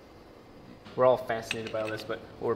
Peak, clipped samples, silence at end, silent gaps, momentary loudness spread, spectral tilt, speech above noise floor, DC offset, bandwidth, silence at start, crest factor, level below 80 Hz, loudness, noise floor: -10 dBFS; under 0.1%; 0 s; none; 18 LU; -5 dB/octave; 22 dB; under 0.1%; 16 kHz; 0 s; 22 dB; -62 dBFS; -30 LUFS; -51 dBFS